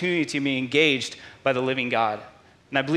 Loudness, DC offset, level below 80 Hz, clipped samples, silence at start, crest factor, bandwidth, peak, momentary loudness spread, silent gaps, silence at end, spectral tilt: -24 LUFS; under 0.1%; -66 dBFS; under 0.1%; 0 s; 20 dB; 12.5 kHz; -6 dBFS; 8 LU; none; 0 s; -4.5 dB/octave